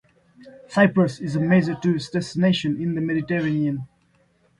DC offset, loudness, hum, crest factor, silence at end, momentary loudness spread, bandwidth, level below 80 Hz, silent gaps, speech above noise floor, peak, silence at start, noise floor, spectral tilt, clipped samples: under 0.1%; -22 LUFS; none; 20 dB; 0.75 s; 8 LU; 11 kHz; -58 dBFS; none; 41 dB; -4 dBFS; 0.4 s; -62 dBFS; -7 dB/octave; under 0.1%